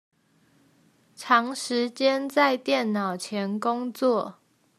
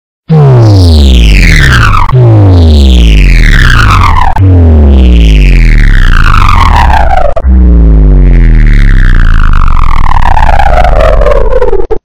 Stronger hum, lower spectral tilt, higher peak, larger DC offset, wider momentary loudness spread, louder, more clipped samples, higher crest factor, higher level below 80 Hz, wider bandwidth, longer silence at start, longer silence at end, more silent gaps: neither; second, -4 dB/octave vs -6.5 dB/octave; second, -6 dBFS vs 0 dBFS; neither; about the same, 7 LU vs 6 LU; second, -25 LUFS vs -5 LUFS; second, under 0.1% vs 70%; first, 22 dB vs 2 dB; second, -84 dBFS vs -4 dBFS; first, 14 kHz vs 11 kHz; first, 1.2 s vs 0.3 s; first, 0.45 s vs 0.15 s; neither